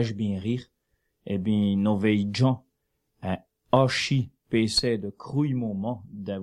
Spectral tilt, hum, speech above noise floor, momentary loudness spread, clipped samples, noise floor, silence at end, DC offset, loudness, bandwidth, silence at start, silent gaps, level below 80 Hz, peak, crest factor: -6 dB/octave; none; 51 dB; 10 LU; under 0.1%; -76 dBFS; 0 s; under 0.1%; -26 LUFS; 12 kHz; 0 s; none; -56 dBFS; -4 dBFS; 22 dB